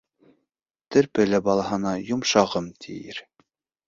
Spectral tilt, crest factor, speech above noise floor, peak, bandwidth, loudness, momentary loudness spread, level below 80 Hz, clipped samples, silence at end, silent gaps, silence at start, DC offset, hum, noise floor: -4.5 dB/octave; 20 dB; 60 dB; -4 dBFS; 7.6 kHz; -23 LUFS; 16 LU; -58 dBFS; under 0.1%; 0.65 s; none; 0.9 s; under 0.1%; none; -82 dBFS